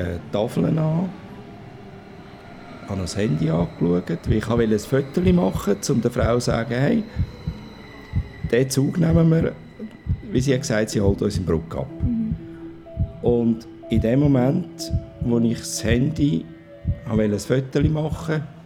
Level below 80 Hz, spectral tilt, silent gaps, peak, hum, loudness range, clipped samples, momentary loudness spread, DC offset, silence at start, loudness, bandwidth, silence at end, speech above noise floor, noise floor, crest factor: -38 dBFS; -6.5 dB/octave; none; -4 dBFS; none; 4 LU; under 0.1%; 20 LU; under 0.1%; 0 s; -22 LUFS; 16 kHz; 0 s; 20 dB; -41 dBFS; 18 dB